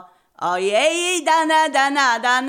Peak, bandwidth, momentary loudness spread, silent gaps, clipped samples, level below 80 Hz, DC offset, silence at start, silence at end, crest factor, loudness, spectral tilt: -6 dBFS; 16.5 kHz; 6 LU; none; under 0.1%; -80 dBFS; under 0.1%; 0.4 s; 0 s; 12 dB; -17 LUFS; -1 dB/octave